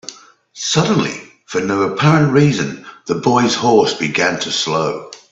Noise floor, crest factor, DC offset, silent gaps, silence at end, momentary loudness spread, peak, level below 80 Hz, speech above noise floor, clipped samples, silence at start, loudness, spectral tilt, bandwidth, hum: -37 dBFS; 16 dB; under 0.1%; none; 0.15 s; 11 LU; 0 dBFS; -54 dBFS; 22 dB; under 0.1%; 0.1 s; -15 LUFS; -5 dB/octave; 8 kHz; none